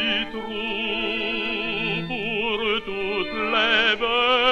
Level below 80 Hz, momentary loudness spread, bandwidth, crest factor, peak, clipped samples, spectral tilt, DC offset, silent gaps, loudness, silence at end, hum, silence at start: -48 dBFS; 8 LU; 10 kHz; 18 dB; -6 dBFS; under 0.1%; -4.5 dB/octave; under 0.1%; none; -22 LUFS; 0 s; none; 0 s